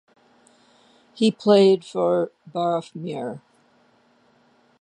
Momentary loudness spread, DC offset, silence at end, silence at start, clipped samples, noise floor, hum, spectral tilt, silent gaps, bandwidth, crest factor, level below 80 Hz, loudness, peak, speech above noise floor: 16 LU; under 0.1%; 1.45 s; 1.15 s; under 0.1%; -60 dBFS; none; -6.5 dB/octave; none; 9.8 kHz; 20 dB; -76 dBFS; -21 LUFS; -4 dBFS; 39 dB